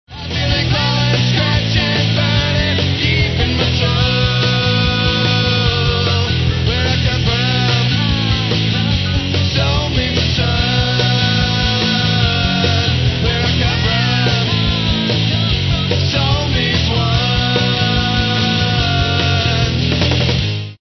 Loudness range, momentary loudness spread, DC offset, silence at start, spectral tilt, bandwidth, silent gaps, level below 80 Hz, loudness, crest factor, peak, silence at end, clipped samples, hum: 1 LU; 2 LU; under 0.1%; 0.1 s; -5.5 dB/octave; 6.4 kHz; none; -26 dBFS; -14 LUFS; 14 dB; 0 dBFS; 0.05 s; under 0.1%; none